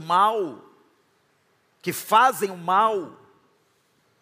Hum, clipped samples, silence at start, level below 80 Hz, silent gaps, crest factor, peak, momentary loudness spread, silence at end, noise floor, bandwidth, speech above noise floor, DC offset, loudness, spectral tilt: none; under 0.1%; 0 s; -80 dBFS; none; 20 dB; -4 dBFS; 15 LU; 1.1 s; -66 dBFS; 15.5 kHz; 44 dB; under 0.1%; -22 LUFS; -3.5 dB/octave